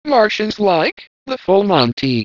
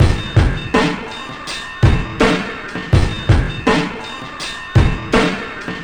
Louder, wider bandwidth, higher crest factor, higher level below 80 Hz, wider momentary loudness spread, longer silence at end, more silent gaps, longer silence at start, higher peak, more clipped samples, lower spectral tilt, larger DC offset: about the same, -15 LUFS vs -17 LUFS; second, 6 kHz vs 10.5 kHz; about the same, 16 dB vs 16 dB; second, -54 dBFS vs -24 dBFS; about the same, 11 LU vs 10 LU; about the same, 0 s vs 0 s; first, 0.92-0.97 s, 1.07-1.26 s, 1.93-1.97 s vs none; about the same, 0.05 s vs 0 s; about the same, 0 dBFS vs 0 dBFS; neither; about the same, -6 dB/octave vs -6 dB/octave; neither